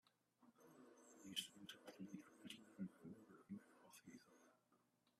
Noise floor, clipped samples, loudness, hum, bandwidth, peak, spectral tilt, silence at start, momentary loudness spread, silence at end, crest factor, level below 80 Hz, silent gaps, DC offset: -82 dBFS; under 0.1%; -57 LUFS; none; 14 kHz; -32 dBFS; -3.5 dB/octave; 0.05 s; 17 LU; 0.1 s; 28 dB; under -90 dBFS; none; under 0.1%